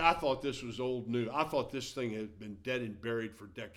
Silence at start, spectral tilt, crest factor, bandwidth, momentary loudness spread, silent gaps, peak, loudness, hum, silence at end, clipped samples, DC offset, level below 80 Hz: 0 s; -5 dB/octave; 24 dB; 16 kHz; 10 LU; none; -12 dBFS; -36 LUFS; none; 0.05 s; under 0.1%; under 0.1%; -60 dBFS